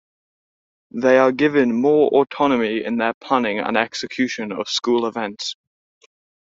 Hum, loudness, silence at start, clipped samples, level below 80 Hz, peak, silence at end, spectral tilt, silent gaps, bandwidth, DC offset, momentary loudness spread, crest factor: none; -19 LUFS; 0.95 s; under 0.1%; -62 dBFS; -2 dBFS; 1.05 s; -4.5 dB/octave; 3.14-3.21 s; 7.8 kHz; under 0.1%; 11 LU; 18 dB